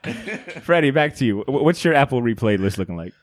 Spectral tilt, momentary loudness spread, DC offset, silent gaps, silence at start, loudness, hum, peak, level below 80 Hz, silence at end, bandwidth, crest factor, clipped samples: -6.5 dB/octave; 13 LU; under 0.1%; none; 0.05 s; -19 LUFS; none; -2 dBFS; -52 dBFS; 0.15 s; 15 kHz; 18 dB; under 0.1%